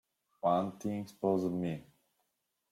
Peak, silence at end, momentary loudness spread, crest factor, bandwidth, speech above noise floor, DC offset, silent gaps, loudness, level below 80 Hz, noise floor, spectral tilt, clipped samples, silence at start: -18 dBFS; 0.9 s; 8 LU; 18 dB; 15.5 kHz; 49 dB; under 0.1%; none; -34 LUFS; -74 dBFS; -83 dBFS; -8 dB/octave; under 0.1%; 0.45 s